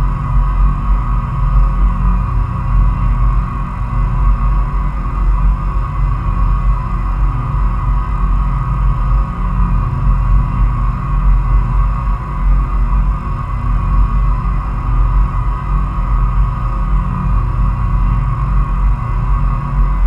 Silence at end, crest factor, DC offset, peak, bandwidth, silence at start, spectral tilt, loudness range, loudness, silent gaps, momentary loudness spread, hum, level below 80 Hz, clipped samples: 0 s; 12 dB; under 0.1%; 0 dBFS; 3.2 kHz; 0 s; -9 dB/octave; 1 LU; -17 LUFS; none; 3 LU; none; -14 dBFS; under 0.1%